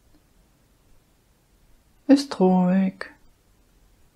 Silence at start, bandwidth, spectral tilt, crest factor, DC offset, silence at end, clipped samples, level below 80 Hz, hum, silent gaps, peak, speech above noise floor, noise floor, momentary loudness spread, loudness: 2.1 s; 11 kHz; -7.5 dB/octave; 20 dB; under 0.1%; 1.1 s; under 0.1%; -60 dBFS; none; none; -4 dBFS; 42 dB; -61 dBFS; 20 LU; -20 LUFS